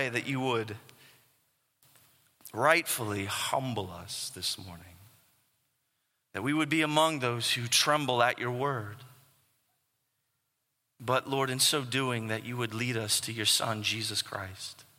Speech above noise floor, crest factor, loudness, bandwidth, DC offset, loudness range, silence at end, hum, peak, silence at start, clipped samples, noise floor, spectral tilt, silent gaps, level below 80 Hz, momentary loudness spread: 50 dB; 24 dB; -29 LUFS; 16.5 kHz; under 0.1%; 7 LU; 0.15 s; none; -8 dBFS; 0 s; under 0.1%; -80 dBFS; -3 dB/octave; none; -72 dBFS; 14 LU